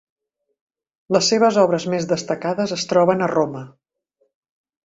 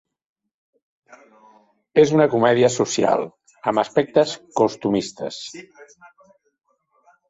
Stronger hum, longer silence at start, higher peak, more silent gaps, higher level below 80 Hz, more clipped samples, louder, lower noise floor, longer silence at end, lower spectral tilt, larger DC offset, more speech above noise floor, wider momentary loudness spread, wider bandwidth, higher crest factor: neither; second, 1.1 s vs 1.95 s; about the same, -2 dBFS vs -2 dBFS; neither; about the same, -64 dBFS vs -64 dBFS; neither; about the same, -19 LUFS vs -19 LUFS; first, -69 dBFS vs -59 dBFS; second, 1.15 s vs 1.45 s; about the same, -4.5 dB/octave vs -5 dB/octave; neither; first, 50 dB vs 40 dB; second, 8 LU vs 15 LU; about the same, 8 kHz vs 8 kHz; about the same, 18 dB vs 20 dB